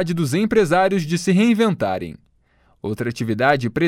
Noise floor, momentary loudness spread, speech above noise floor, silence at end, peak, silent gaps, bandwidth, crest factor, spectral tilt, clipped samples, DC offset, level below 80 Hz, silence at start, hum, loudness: -59 dBFS; 12 LU; 40 dB; 0 s; -2 dBFS; none; 15.5 kHz; 16 dB; -6 dB/octave; under 0.1%; under 0.1%; -52 dBFS; 0 s; none; -19 LUFS